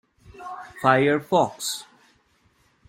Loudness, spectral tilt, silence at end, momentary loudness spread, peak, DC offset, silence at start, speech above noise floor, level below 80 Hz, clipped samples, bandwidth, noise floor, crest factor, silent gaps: -22 LUFS; -4.5 dB/octave; 1.05 s; 19 LU; -4 dBFS; under 0.1%; 0.4 s; 42 dB; -62 dBFS; under 0.1%; 16.5 kHz; -63 dBFS; 22 dB; none